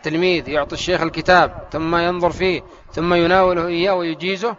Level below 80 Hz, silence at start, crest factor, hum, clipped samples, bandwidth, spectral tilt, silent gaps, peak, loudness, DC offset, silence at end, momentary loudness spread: -42 dBFS; 0.05 s; 18 dB; none; under 0.1%; 7.6 kHz; -3.5 dB/octave; none; 0 dBFS; -18 LUFS; under 0.1%; 0.05 s; 8 LU